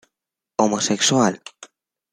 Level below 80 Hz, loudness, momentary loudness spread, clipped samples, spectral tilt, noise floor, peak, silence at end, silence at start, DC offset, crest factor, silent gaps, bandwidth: -66 dBFS; -19 LUFS; 18 LU; under 0.1%; -3.5 dB/octave; -85 dBFS; -2 dBFS; 0.45 s; 0.6 s; under 0.1%; 20 dB; none; 13 kHz